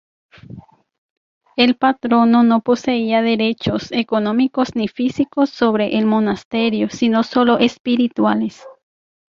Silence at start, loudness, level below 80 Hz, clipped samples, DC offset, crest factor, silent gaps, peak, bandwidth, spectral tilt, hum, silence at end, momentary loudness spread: 0.5 s; -17 LUFS; -54 dBFS; under 0.1%; under 0.1%; 16 dB; 0.98-1.41 s, 6.45-6.51 s, 7.80-7.84 s; 0 dBFS; 7.2 kHz; -6 dB/octave; none; 0.65 s; 6 LU